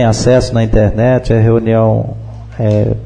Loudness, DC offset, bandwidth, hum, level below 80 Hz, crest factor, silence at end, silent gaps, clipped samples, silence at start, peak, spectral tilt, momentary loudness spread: -12 LUFS; under 0.1%; 9.8 kHz; none; -24 dBFS; 10 dB; 0 s; none; under 0.1%; 0 s; 0 dBFS; -7 dB/octave; 10 LU